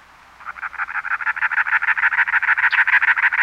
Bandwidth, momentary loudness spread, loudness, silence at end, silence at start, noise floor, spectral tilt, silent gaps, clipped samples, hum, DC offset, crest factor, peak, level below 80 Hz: 10.5 kHz; 16 LU; -17 LUFS; 0 s; 0.4 s; -38 dBFS; -0.5 dB/octave; none; under 0.1%; none; under 0.1%; 14 dB; -6 dBFS; -60 dBFS